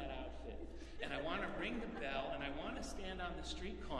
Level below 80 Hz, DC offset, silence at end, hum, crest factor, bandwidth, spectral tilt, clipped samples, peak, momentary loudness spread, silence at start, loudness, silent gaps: -52 dBFS; under 0.1%; 0 s; none; 18 dB; 12.5 kHz; -4.5 dB/octave; under 0.1%; -26 dBFS; 9 LU; 0 s; -45 LUFS; none